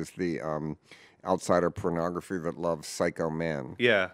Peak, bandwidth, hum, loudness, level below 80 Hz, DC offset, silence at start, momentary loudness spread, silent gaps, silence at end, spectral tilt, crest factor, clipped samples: -8 dBFS; 16 kHz; none; -30 LUFS; -60 dBFS; under 0.1%; 0 s; 9 LU; none; 0 s; -5 dB/octave; 22 dB; under 0.1%